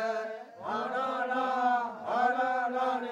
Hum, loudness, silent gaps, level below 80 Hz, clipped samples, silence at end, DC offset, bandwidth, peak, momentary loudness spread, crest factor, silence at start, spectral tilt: none; -30 LUFS; none; -82 dBFS; under 0.1%; 0 s; under 0.1%; 9.6 kHz; -16 dBFS; 8 LU; 14 dB; 0 s; -4 dB/octave